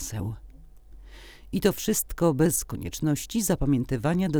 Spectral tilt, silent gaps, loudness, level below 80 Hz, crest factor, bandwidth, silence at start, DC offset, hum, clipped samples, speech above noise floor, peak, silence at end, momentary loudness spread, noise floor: -5.5 dB/octave; none; -26 LUFS; -42 dBFS; 20 dB; over 20 kHz; 0 s; under 0.1%; none; under 0.1%; 22 dB; -8 dBFS; 0 s; 11 LU; -47 dBFS